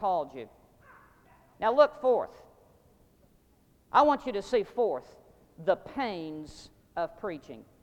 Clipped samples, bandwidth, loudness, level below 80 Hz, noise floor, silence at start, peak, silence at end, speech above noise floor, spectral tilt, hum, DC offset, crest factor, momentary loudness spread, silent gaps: under 0.1%; 9.2 kHz; -29 LUFS; -62 dBFS; -64 dBFS; 0 s; -8 dBFS; 0.2 s; 35 dB; -5.5 dB/octave; none; under 0.1%; 24 dB; 20 LU; none